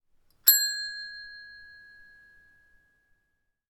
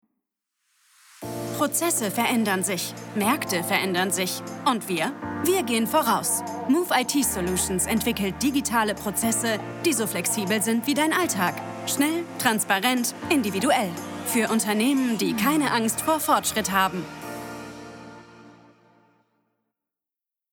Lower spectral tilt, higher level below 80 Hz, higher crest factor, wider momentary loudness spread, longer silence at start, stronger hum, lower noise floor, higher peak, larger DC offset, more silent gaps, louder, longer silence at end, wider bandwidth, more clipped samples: second, 5.5 dB/octave vs -3 dB/octave; second, -70 dBFS vs -58 dBFS; first, 28 dB vs 18 dB; first, 25 LU vs 9 LU; second, 0.45 s vs 1.2 s; neither; second, -77 dBFS vs -87 dBFS; first, -4 dBFS vs -8 dBFS; neither; neither; about the same, -23 LUFS vs -24 LUFS; about the same, 2.05 s vs 2 s; about the same, 19 kHz vs over 20 kHz; neither